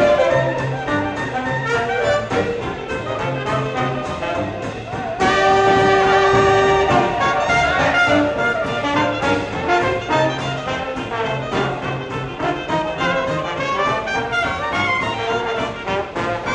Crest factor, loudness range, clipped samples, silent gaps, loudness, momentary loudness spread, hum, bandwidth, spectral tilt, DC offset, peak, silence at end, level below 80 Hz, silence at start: 16 dB; 7 LU; under 0.1%; none; -18 LUFS; 10 LU; none; 10 kHz; -5 dB/octave; under 0.1%; -2 dBFS; 0 s; -40 dBFS; 0 s